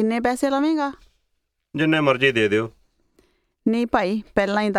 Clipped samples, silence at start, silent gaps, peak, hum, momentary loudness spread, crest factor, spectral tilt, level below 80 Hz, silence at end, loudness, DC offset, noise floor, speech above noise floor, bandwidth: under 0.1%; 0 s; none; -2 dBFS; none; 9 LU; 20 dB; -5.5 dB/octave; -52 dBFS; 0 s; -21 LUFS; under 0.1%; -73 dBFS; 53 dB; 14 kHz